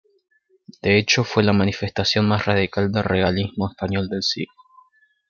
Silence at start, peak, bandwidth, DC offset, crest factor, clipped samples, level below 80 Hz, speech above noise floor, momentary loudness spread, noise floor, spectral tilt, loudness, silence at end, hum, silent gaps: 0.7 s; -4 dBFS; 7.2 kHz; under 0.1%; 18 dB; under 0.1%; -54 dBFS; 37 dB; 9 LU; -58 dBFS; -5 dB/octave; -20 LUFS; 0.85 s; none; none